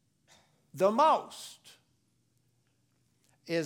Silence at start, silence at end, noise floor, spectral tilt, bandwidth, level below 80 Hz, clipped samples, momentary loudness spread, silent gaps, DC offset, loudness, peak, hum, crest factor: 0.75 s; 0 s; -73 dBFS; -5 dB/octave; 18 kHz; -86 dBFS; under 0.1%; 21 LU; none; under 0.1%; -28 LUFS; -12 dBFS; none; 20 dB